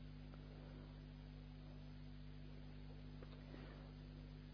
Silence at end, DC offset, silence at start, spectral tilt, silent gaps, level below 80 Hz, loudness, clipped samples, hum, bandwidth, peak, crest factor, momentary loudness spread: 0 s; under 0.1%; 0 s; -6.5 dB/octave; none; -60 dBFS; -57 LUFS; under 0.1%; 50 Hz at -55 dBFS; 5.4 kHz; -42 dBFS; 14 dB; 1 LU